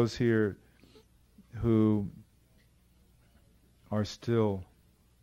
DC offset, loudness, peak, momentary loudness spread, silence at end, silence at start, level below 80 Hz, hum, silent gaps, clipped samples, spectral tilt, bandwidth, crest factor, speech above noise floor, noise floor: under 0.1%; -30 LUFS; -16 dBFS; 15 LU; 0.6 s; 0 s; -56 dBFS; 60 Hz at -60 dBFS; none; under 0.1%; -7.5 dB/octave; 11.5 kHz; 18 dB; 36 dB; -64 dBFS